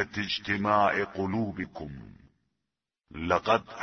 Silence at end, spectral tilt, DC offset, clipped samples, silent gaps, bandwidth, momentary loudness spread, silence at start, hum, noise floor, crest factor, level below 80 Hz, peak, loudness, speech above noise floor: 0 s; -6 dB/octave; under 0.1%; under 0.1%; none; 6.6 kHz; 18 LU; 0 s; none; -87 dBFS; 22 dB; -56 dBFS; -8 dBFS; -28 LUFS; 58 dB